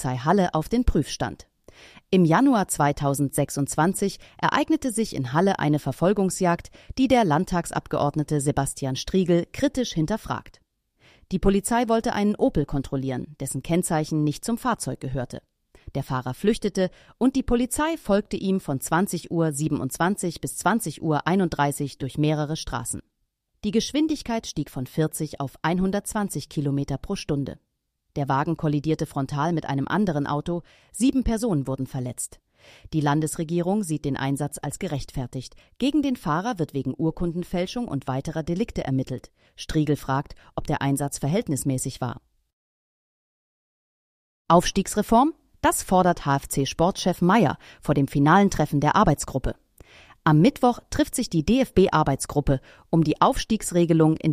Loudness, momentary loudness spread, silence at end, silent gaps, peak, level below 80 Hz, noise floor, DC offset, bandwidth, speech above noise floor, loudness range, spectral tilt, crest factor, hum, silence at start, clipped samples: -24 LUFS; 11 LU; 0 s; 42.53-44.45 s; -4 dBFS; -42 dBFS; -75 dBFS; under 0.1%; 15.5 kHz; 52 dB; 6 LU; -5.5 dB/octave; 20 dB; none; 0 s; under 0.1%